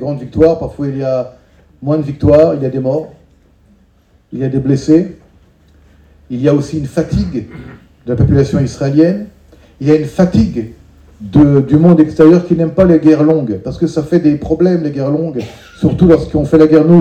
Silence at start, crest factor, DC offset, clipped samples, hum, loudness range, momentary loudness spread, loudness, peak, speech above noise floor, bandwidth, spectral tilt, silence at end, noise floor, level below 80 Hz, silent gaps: 0 s; 12 dB; under 0.1%; 0.7%; none; 7 LU; 16 LU; -12 LUFS; 0 dBFS; 39 dB; 9 kHz; -9 dB/octave; 0 s; -50 dBFS; -34 dBFS; none